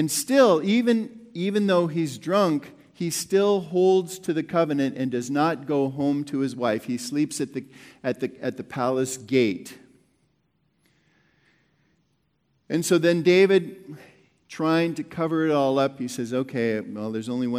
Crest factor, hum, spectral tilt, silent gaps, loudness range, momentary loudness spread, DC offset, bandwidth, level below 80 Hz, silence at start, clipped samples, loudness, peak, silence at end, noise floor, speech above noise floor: 18 dB; none; -5 dB/octave; none; 7 LU; 12 LU; under 0.1%; 16.5 kHz; -72 dBFS; 0 s; under 0.1%; -24 LUFS; -6 dBFS; 0 s; -70 dBFS; 47 dB